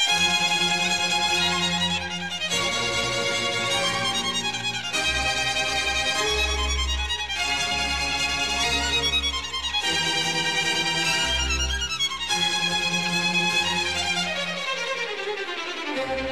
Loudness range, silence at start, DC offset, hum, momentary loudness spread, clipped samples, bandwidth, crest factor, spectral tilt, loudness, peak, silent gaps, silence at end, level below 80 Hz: 1 LU; 0 s; 0.4%; none; 6 LU; under 0.1%; 15.5 kHz; 14 dB; -1.5 dB/octave; -23 LUFS; -12 dBFS; none; 0 s; -38 dBFS